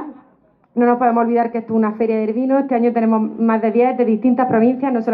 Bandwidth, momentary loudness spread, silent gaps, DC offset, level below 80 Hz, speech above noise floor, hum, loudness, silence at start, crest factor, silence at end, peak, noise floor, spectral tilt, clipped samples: 4.7 kHz; 4 LU; none; under 0.1%; -68 dBFS; 39 dB; none; -17 LUFS; 0 s; 12 dB; 0 s; -4 dBFS; -55 dBFS; -11 dB/octave; under 0.1%